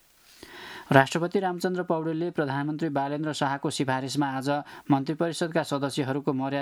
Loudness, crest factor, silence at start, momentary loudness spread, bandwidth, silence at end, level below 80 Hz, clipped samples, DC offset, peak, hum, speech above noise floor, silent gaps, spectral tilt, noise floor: -27 LUFS; 26 dB; 0.4 s; 7 LU; 15 kHz; 0 s; -70 dBFS; under 0.1%; under 0.1%; 0 dBFS; none; 25 dB; none; -5.5 dB/octave; -52 dBFS